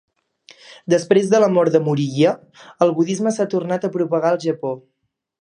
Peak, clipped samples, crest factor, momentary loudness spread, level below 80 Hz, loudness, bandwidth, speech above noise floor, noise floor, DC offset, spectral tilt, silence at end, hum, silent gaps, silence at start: -2 dBFS; under 0.1%; 18 dB; 11 LU; -68 dBFS; -18 LUFS; 11 kHz; 33 dB; -51 dBFS; under 0.1%; -6.5 dB/octave; 0.6 s; none; none; 0.7 s